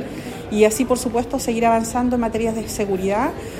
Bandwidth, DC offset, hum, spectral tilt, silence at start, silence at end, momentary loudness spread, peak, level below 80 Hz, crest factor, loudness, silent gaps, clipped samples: 16 kHz; under 0.1%; none; -5 dB/octave; 0 s; 0 s; 7 LU; -2 dBFS; -40 dBFS; 18 dB; -20 LUFS; none; under 0.1%